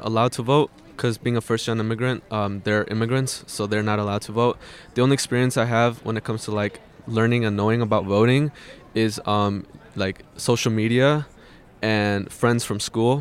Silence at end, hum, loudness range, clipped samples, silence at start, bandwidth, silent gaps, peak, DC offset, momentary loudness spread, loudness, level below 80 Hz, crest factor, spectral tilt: 0 s; none; 2 LU; under 0.1%; 0 s; 15.5 kHz; none; -6 dBFS; under 0.1%; 9 LU; -23 LUFS; -56 dBFS; 16 dB; -5.5 dB/octave